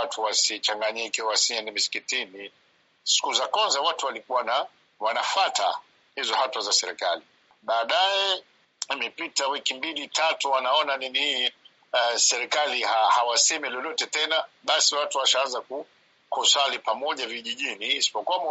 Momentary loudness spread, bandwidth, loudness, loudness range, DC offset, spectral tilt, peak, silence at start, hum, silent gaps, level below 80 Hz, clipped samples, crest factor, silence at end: 10 LU; 8 kHz; -24 LUFS; 3 LU; under 0.1%; 4 dB/octave; -4 dBFS; 0 s; none; none; -86 dBFS; under 0.1%; 22 dB; 0 s